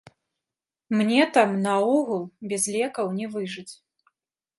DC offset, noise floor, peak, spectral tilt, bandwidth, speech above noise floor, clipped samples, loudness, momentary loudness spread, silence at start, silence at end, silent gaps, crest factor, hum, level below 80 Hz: under 0.1%; -89 dBFS; -6 dBFS; -4.5 dB/octave; 12 kHz; 66 dB; under 0.1%; -24 LUFS; 12 LU; 0.9 s; 0.85 s; none; 20 dB; none; -76 dBFS